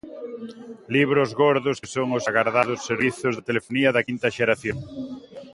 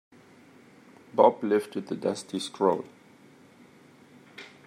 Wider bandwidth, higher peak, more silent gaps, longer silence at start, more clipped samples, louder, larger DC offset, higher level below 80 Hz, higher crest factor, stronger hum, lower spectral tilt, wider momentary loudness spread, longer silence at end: second, 11.5 kHz vs 13.5 kHz; about the same, -4 dBFS vs -6 dBFS; neither; second, 0.05 s vs 1.15 s; neither; first, -22 LUFS vs -27 LUFS; neither; first, -58 dBFS vs -80 dBFS; about the same, 20 dB vs 24 dB; neither; about the same, -5.5 dB/octave vs -5 dB/octave; second, 16 LU vs 24 LU; second, 0 s vs 0.2 s